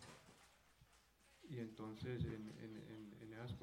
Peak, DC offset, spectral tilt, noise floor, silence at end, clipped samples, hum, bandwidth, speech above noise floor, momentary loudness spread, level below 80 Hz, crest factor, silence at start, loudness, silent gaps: -32 dBFS; under 0.1%; -7 dB/octave; -73 dBFS; 0 s; under 0.1%; none; 16.5 kHz; 22 dB; 20 LU; -68 dBFS; 20 dB; 0 s; -52 LUFS; none